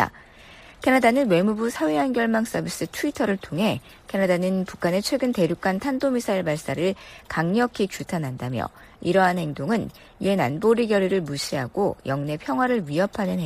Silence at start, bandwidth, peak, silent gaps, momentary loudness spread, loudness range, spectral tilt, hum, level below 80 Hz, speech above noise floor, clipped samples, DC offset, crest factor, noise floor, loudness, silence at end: 0 s; 15 kHz; -6 dBFS; none; 9 LU; 2 LU; -5.5 dB/octave; none; -54 dBFS; 24 dB; under 0.1%; under 0.1%; 18 dB; -47 dBFS; -24 LUFS; 0 s